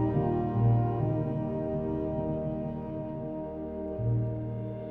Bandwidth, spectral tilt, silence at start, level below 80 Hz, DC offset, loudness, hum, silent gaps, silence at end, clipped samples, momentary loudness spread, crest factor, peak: 3.3 kHz; -12 dB/octave; 0 s; -48 dBFS; under 0.1%; -31 LUFS; none; none; 0 s; under 0.1%; 10 LU; 14 dB; -16 dBFS